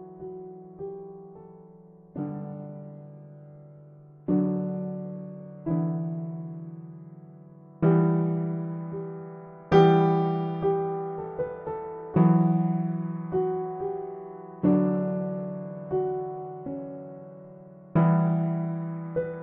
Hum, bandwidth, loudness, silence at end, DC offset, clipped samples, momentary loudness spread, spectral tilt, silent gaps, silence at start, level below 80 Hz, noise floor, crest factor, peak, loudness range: none; 5.2 kHz; -27 LUFS; 0 s; under 0.1%; under 0.1%; 22 LU; -8.5 dB/octave; none; 0 s; -62 dBFS; -51 dBFS; 22 dB; -6 dBFS; 10 LU